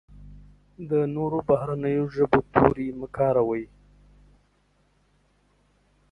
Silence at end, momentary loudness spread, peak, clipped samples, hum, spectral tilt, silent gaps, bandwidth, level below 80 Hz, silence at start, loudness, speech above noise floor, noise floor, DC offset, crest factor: 2.45 s; 11 LU; 0 dBFS; under 0.1%; 50 Hz at -55 dBFS; -9.5 dB/octave; none; 5.8 kHz; -50 dBFS; 0.1 s; -24 LUFS; 42 dB; -65 dBFS; under 0.1%; 26 dB